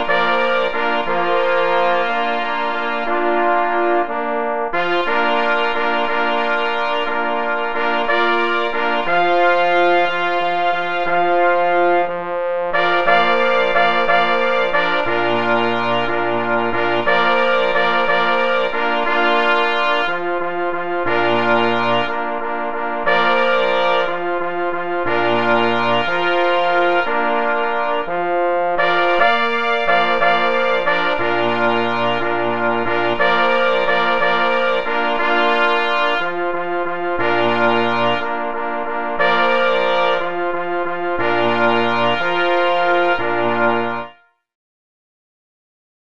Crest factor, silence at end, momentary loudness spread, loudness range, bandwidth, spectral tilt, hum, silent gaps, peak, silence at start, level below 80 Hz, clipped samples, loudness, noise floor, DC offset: 18 dB; 1.6 s; 6 LU; 2 LU; 8 kHz; -5.5 dB/octave; none; none; 0 dBFS; 0 s; -52 dBFS; under 0.1%; -17 LUFS; -43 dBFS; 5%